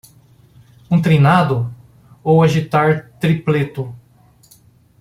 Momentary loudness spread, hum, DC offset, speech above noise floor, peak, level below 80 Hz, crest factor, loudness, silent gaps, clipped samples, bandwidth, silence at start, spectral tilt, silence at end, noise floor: 14 LU; none; under 0.1%; 36 dB; 0 dBFS; -50 dBFS; 18 dB; -16 LUFS; none; under 0.1%; 14 kHz; 0.9 s; -8 dB/octave; 1.05 s; -50 dBFS